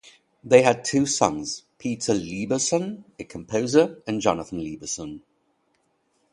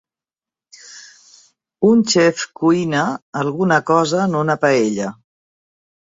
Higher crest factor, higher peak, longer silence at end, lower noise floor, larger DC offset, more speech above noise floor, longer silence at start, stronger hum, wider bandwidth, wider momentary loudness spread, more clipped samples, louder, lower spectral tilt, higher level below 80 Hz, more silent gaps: first, 24 dB vs 18 dB; about the same, -2 dBFS vs -2 dBFS; first, 1.15 s vs 1 s; second, -69 dBFS vs under -90 dBFS; neither; second, 46 dB vs over 74 dB; second, 0.45 s vs 0.85 s; neither; first, 11 kHz vs 8 kHz; first, 16 LU vs 9 LU; neither; second, -23 LUFS vs -17 LUFS; about the same, -4 dB/octave vs -5 dB/octave; about the same, -58 dBFS vs -60 dBFS; second, none vs 3.22-3.33 s